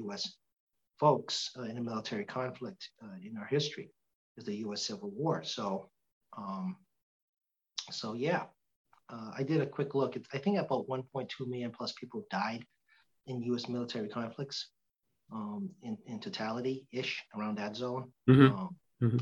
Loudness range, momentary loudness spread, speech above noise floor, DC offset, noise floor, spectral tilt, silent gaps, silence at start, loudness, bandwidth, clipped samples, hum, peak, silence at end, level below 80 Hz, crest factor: 6 LU; 14 LU; 49 dB; under 0.1%; -83 dBFS; -6 dB/octave; 0.60-0.67 s, 4.15-4.35 s, 6.12-6.21 s, 7.02-7.33 s, 8.76-8.85 s; 0 s; -35 LUFS; 8 kHz; under 0.1%; none; -10 dBFS; 0 s; -76 dBFS; 26 dB